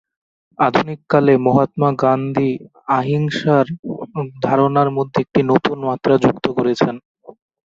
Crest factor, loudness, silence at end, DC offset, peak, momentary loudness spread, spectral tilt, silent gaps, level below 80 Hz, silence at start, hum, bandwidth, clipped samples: 16 dB; -17 LUFS; 0.35 s; under 0.1%; 0 dBFS; 8 LU; -8 dB/octave; 3.79-3.83 s, 7.05-7.15 s; -54 dBFS; 0.6 s; none; 7.6 kHz; under 0.1%